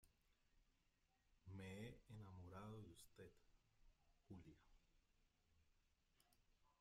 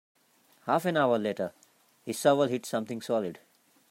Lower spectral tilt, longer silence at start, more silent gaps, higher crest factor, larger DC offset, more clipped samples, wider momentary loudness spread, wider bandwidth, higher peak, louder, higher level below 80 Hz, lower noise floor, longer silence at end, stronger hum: about the same, -6 dB/octave vs -5 dB/octave; second, 0.05 s vs 0.65 s; neither; about the same, 20 dB vs 20 dB; neither; neither; second, 9 LU vs 13 LU; second, 13.5 kHz vs 16 kHz; second, -44 dBFS vs -10 dBFS; second, -61 LUFS vs -29 LUFS; about the same, -78 dBFS vs -80 dBFS; first, -85 dBFS vs -64 dBFS; second, 0.05 s vs 0.55 s; neither